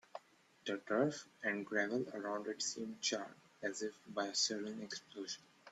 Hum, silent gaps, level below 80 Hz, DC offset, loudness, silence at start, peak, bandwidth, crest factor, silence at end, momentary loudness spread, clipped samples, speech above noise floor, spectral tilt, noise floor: none; none; -86 dBFS; under 0.1%; -40 LUFS; 0.15 s; -22 dBFS; 13 kHz; 20 dB; 0 s; 11 LU; under 0.1%; 24 dB; -2.5 dB/octave; -65 dBFS